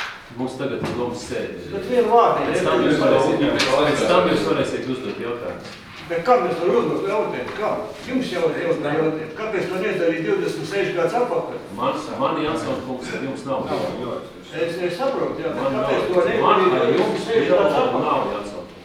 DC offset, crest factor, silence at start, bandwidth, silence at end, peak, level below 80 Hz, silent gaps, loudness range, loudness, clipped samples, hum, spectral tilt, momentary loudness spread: under 0.1%; 20 dB; 0 s; 14.5 kHz; 0 s; -2 dBFS; -52 dBFS; none; 7 LU; -21 LUFS; under 0.1%; none; -5.5 dB/octave; 11 LU